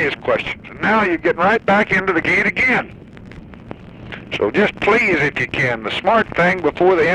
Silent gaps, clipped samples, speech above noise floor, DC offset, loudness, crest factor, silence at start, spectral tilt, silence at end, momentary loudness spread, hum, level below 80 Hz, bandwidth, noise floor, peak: none; under 0.1%; 20 dB; under 0.1%; -16 LUFS; 14 dB; 0 s; -6 dB/octave; 0 s; 18 LU; none; -44 dBFS; 10.5 kHz; -37 dBFS; -2 dBFS